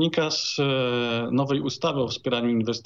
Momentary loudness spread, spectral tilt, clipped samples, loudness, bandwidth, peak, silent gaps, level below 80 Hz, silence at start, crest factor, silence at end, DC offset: 3 LU; -5 dB/octave; under 0.1%; -25 LUFS; 7.6 kHz; -10 dBFS; none; -66 dBFS; 0 s; 14 dB; 0.05 s; under 0.1%